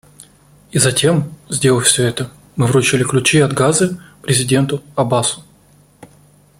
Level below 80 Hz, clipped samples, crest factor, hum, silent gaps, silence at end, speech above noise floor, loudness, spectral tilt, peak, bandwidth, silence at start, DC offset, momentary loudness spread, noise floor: -48 dBFS; under 0.1%; 16 dB; none; none; 0.55 s; 35 dB; -15 LUFS; -4 dB/octave; 0 dBFS; 16 kHz; 0.75 s; under 0.1%; 10 LU; -49 dBFS